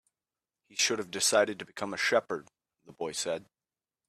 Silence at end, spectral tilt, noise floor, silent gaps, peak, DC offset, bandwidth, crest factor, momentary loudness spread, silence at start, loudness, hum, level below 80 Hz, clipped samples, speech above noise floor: 0.65 s; -1.5 dB/octave; under -90 dBFS; none; -12 dBFS; under 0.1%; 15 kHz; 20 dB; 14 LU; 0.75 s; -30 LUFS; none; -76 dBFS; under 0.1%; over 59 dB